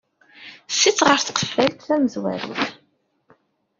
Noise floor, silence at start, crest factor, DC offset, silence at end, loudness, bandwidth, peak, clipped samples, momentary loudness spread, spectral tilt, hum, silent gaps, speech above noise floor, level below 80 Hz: -66 dBFS; 0.4 s; 22 dB; under 0.1%; 1.05 s; -20 LUFS; 7.6 kHz; 0 dBFS; under 0.1%; 11 LU; -2.5 dB/octave; none; none; 46 dB; -62 dBFS